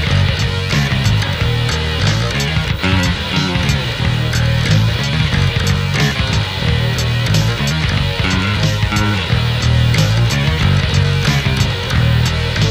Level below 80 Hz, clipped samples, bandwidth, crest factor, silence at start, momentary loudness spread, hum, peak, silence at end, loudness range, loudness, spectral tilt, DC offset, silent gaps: -24 dBFS; under 0.1%; 16 kHz; 14 dB; 0 s; 3 LU; none; 0 dBFS; 0 s; 1 LU; -15 LUFS; -5 dB/octave; under 0.1%; none